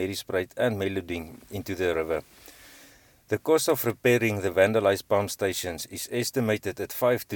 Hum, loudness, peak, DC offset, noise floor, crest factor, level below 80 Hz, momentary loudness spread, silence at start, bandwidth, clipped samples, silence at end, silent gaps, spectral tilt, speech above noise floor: none; -26 LUFS; -8 dBFS; under 0.1%; -55 dBFS; 20 dB; -58 dBFS; 10 LU; 0 s; 19 kHz; under 0.1%; 0 s; none; -4.5 dB/octave; 29 dB